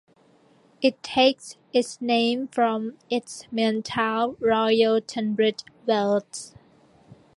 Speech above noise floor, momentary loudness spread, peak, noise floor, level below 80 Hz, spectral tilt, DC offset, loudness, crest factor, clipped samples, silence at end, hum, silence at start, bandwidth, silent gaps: 35 dB; 10 LU; -6 dBFS; -58 dBFS; -66 dBFS; -4 dB/octave; under 0.1%; -24 LUFS; 20 dB; under 0.1%; 0.9 s; none; 0.8 s; 11.5 kHz; none